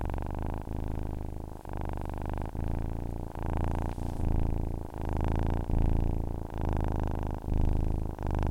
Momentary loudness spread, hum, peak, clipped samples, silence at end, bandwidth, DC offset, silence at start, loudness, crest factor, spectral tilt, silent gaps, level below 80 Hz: 7 LU; none; -14 dBFS; under 0.1%; 0 s; 10.5 kHz; 0.1%; 0 s; -34 LUFS; 16 dB; -8.5 dB/octave; none; -32 dBFS